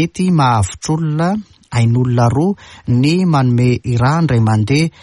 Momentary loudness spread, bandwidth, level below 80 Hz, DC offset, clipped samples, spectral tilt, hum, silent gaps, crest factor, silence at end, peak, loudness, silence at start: 6 LU; 11.5 kHz; -40 dBFS; under 0.1%; under 0.1%; -7 dB/octave; none; none; 10 dB; 0.15 s; -2 dBFS; -14 LUFS; 0 s